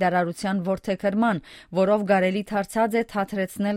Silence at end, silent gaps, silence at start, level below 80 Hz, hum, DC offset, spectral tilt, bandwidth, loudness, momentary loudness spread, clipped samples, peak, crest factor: 0 s; none; 0 s; -56 dBFS; none; under 0.1%; -6.5 dB/octave; 16 kHz; -24 LUFS; 6 LU; under 0.1%; -6 dBFS; 16 dB